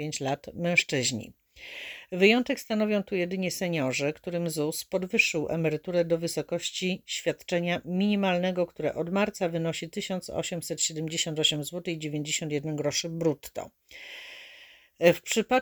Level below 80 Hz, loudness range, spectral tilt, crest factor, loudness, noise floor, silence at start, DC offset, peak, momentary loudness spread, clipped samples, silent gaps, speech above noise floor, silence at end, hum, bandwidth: -64 dBFS; 3 LU; -4 dB/octave; 24 dB; -28 LUFS; -53 dBFS; 0 s; under 0.1%; -6 dBFS; 15 LU; under 0.1%; none; 25 dB; 0 s; none; over 20 kHz